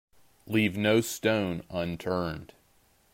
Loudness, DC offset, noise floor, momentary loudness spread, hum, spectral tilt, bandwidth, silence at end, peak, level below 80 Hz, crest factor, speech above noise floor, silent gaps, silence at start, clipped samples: -28 LUFS; under 0.1%; -65 dBFS; 8 LU; none; -5 dB/octave; 16 kHz; 0.7 s; -12 dBFS; -60 dBFS; 18 dB; 36 dB; none; 0.45 s; under 0.1%